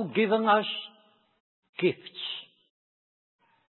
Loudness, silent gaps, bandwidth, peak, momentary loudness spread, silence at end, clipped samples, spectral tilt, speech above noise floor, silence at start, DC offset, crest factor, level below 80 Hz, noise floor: -28 LUFS; 1.40-1.63 s, 1.69-1.73 s; 4.3 kHz; -10 dBFS; 17 LU; 1.25 s; under 0.1%; -9 dB/octave; 36 dB; 0 s; under 0.1%; 20 dB; -86 dBFS; -63 dBFS